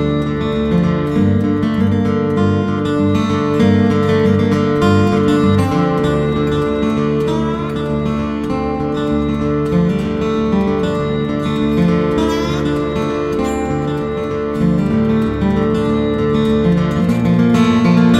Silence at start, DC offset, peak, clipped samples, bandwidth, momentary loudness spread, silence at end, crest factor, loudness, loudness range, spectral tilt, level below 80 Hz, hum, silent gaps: 0 s; under 0.1%; -2 dBFS; under 0.1%; 12 kHz; 6 LU; 0 s; 12 dB; -15 LUFS; 4 LU; -8 dB/octave; -32 dBFS; none; none